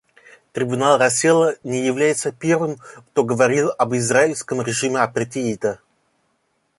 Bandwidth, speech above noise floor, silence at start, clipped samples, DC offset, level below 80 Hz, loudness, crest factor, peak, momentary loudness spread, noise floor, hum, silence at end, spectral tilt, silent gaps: 11.5 kHz; 49 dB; 0.55 s; under 0.1%; under 0.1%; -62 dBFS; -19 LUFS; 18 dB; -2 dBFS; 10 LU; -68 dBFS; none; 1.05 s; -4.5 dB/octave; none